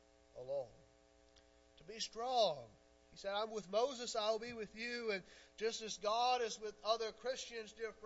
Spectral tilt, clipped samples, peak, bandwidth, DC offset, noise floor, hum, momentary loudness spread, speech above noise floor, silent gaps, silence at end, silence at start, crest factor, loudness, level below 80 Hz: -0.5 dB/octave; under 0.1%; -22 dBFS; 7.6 kHz; under 0.1%; -69 dBFS; none; 16 LU; 28 dB; none; 0.05 s; 0.35 s; 20 dB; -41 LUFS; -74 dBFS